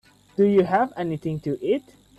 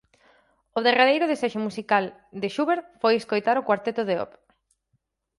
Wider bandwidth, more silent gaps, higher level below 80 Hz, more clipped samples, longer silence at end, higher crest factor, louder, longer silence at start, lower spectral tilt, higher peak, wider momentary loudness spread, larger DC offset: about the same, 11.5 kHz vs 11.5 kHz; neither; first, -60 dBFS vs -70 dBFS; neither; second, 0.4 s vs 1.15 s; about the same, 16 dB vs 20 dB; about the same, -23 LUFS vs -24 LUFS; second, 0.4 s vs 0.75 s; first, -8.5 dB/octave vs -5 dB/octave; about the same, -8 dBFS vs -6 dBFS; second, 9 LU vs 12 LU; neither